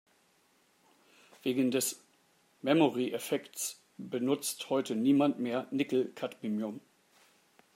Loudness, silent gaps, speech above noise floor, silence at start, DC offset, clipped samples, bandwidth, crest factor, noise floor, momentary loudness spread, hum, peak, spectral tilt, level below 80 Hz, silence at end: -32 LUFS; none; 38 dB; 1.45 s; under 0.1%; under 0.1%; 16 kHz; 20 dB; -69 dBFS; 12 LU; none; -12 dBFS; -4.5 dB/octave; -84 dBFS; 0.95 s